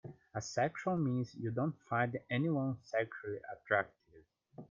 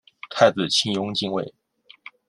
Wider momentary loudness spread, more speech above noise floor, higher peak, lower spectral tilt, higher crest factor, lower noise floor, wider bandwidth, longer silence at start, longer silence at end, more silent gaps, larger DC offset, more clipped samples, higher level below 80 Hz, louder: second, 10 LU vs 13 LU; about the same, 29 dB vs 26 dB; second, -16 dBFS vs -2 dBFS; first, -6.5 dB/octave vs -3.5 dB/octave; about the same, 22 dB vs 22 dB; first, -65 dBFS vs -47 dBFS; second, 7.6 kHz vs 12 kHz; second, 0.05 s vs 0.25 s; second, 0.05 s vs 0.8 s; neither; neither; neither; second, -74 dBFS vs -66 dBFS; second, -37 LUFS vs -21 LUFS